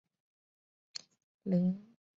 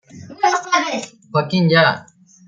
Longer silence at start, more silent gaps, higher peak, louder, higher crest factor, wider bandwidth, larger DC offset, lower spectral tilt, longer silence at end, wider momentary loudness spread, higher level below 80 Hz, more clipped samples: first, 1.45 s vs 0.15 s; neither; second, -20 dBFS vs -2 dBFS; second, -34 LUFS vs -17 LUFS; about the same, 18 dB vs 16 dB; second, 8 kHz vs 9 kHz; neither; first, -7.5 dB/octave vs -5 dB/octave; about the same, 0.35 s vs 0.45 s; first, 16 LU vs 11 LU; second, -78 dBFS vs -62 dBFS; neither